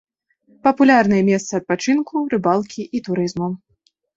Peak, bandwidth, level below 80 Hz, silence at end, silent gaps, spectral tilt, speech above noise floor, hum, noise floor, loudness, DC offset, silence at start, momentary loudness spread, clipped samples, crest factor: -2 dBFS; 7.8 kHz; -60 dBFS; 0.6 s; none; -6 dB/octave; 47 dB; none; -64 dBFS; -18 LUFS; under 0.1%; 0.65 s; 13 LU; under 0.1%; 18 dB